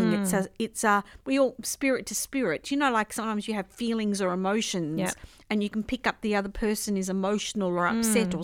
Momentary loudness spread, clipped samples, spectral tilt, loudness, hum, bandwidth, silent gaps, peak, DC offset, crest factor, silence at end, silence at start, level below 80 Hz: 6 LU; under 0.1%; -4 dB/octave; -28 LUFS; none; 17 kHz; none; -10 dBFS; under 0.1%; 16 dB; 0 s; 0 s; -52 dBFS